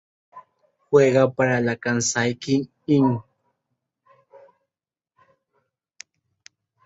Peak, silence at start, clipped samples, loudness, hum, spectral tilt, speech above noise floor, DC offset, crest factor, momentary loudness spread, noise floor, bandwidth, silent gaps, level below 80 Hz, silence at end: -4 dBFS; 0.35 s; under 0.1%; -21 LUFS; none; -5 dB/octave; over 71 dB; under 0.1%; 20 dB; 7 LU; under -90 dBFS; 8 kHz; none; -64 dBFS; 3.65 s